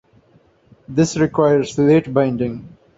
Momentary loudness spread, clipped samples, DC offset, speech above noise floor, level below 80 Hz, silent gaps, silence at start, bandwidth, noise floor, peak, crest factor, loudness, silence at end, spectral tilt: 10 LU; under 0.1%; under 0.1%; 38 dB; -52 dBFS; none; 0.9 s; 8 kHz; -54 dBFS; -2 dBFS; 16 dB; -17 LUFS; 0.3 s; -6.5 dB/octave